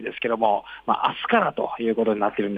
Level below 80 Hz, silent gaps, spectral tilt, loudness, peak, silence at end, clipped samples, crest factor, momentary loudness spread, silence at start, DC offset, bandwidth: -62 dBFS; none; -7.5 dB/octave; -23 LUFS; -6 dBFS; 0 s; under 0.1%; 18 dB; 5 LU; 0 s; under 0.1%; 4.9 kHz